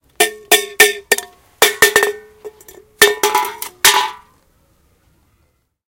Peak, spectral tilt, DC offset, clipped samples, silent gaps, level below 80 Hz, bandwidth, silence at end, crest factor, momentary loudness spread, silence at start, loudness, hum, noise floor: 0 dBFS; 0.5 dB/octave; under 0.1%; 0.3%; none; -56 dBFS; over 20 kHz; 1.7 s; 18 dB; 9 LU; 0.2 s; -13 LUFS; none; -62 dBFS